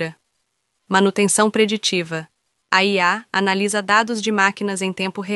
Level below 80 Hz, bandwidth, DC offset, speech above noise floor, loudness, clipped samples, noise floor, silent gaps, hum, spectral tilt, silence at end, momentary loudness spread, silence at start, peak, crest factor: -68 dBFS; 11.5 kHz; under 0.1%; 53 dB; -18 LUFS; under 0.1%; -72 dBFS; none; none; -3.5 dB/octave; 0 s; 7 LU; 0 s; 0 dBFS; 18 dB